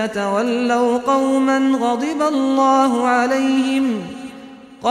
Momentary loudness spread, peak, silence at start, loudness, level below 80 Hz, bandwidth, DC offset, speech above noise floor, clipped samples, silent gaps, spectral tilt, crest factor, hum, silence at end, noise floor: 8 LU; -4 dBFS; 0 s; -17 LUFS; -60 dBFS; 11 kHz; under 0.1%; 22 dB; under 0.1%; none; -4.5 dB/octave; 14 dB; none; 0 s; -38 dBFS